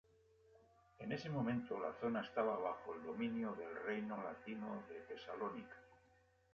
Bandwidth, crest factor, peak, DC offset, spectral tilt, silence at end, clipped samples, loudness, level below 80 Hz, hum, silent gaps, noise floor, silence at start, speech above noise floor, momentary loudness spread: 6.8 kHz; 20 dB; -26 dBFS; under 0.1%; -5.5 dB/octave; 0.55 s; under 0.1%; -45 LUFS; -78 dBFS; none; none; -73 dBFS; 0.5 s; 29 dB; 11 LU